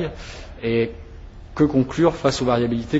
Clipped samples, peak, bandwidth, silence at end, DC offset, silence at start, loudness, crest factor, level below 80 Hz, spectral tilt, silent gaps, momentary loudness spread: under 0.1%; -4 dBFS; 8 kHz; 0 s; under 0.1%; 0 s; -21 LUFS; 18 dB; -40 dBFS; -6.5 dB/octave; none; 18 LU